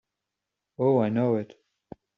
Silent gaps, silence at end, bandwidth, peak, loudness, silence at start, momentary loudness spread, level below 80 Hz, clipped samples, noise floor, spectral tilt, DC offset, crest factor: none; 0.7 s; 5.8 kHz; -12 dBFS; -25 LUFS; 0.8 s; 9 LU; -70 dBFS; under 0.1%; -86 dBFS; -8.5 dB/octave; under 0.1%; 18 dB